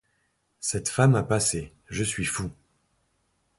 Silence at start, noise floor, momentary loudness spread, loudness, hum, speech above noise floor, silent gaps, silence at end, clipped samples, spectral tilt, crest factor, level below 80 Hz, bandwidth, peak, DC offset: 0.6 s; -72 dBFS; 12 LU; -26 LUFS; none; 47 dB; none; 1.05 s; under 0.1%; -4.5 dB/octave; 20 dB; -50 dBFS; 12 kHz; -8 dBFS; under 0.1%